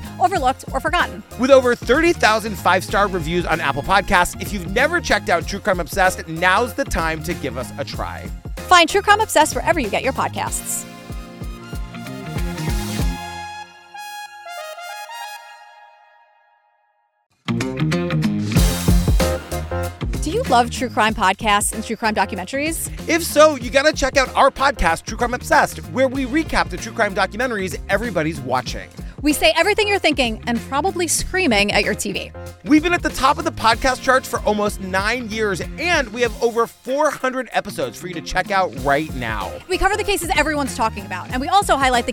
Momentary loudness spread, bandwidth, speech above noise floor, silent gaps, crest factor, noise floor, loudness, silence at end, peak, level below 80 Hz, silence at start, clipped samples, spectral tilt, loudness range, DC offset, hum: 16 LU; 18 kHz; 46 dB; 17.26-17.30 s; 20 dB; -64 dBFS; -19 LUFS; 0 s; 0 dBFS; -32 dBFS; 0 s; under 0.1%; -4 dB/octave; 11 LU; under 0.1%; none